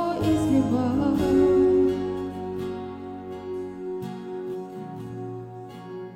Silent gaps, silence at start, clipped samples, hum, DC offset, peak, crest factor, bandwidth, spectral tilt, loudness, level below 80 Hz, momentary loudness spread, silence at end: none; 0 s; under 0.1%; none; under 0.1%; -10 dBFS; 16 dB; 15.5 kHz; -7.5 dB/octave; -25 LUFS; -48 dBFS; 17 LU; 0 s